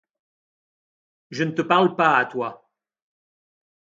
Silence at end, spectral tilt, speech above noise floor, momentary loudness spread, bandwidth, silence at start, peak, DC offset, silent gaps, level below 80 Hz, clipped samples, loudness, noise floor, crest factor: 1.45 s; -6 dB/octave; over 69 dB; 13 LU; 7.6 kHz; 1.3 s; -4 dBFS; under 0.1%; none; -74 dBFS; under 0.1%; -21 LUFS; under -90 dBFS; 22 dB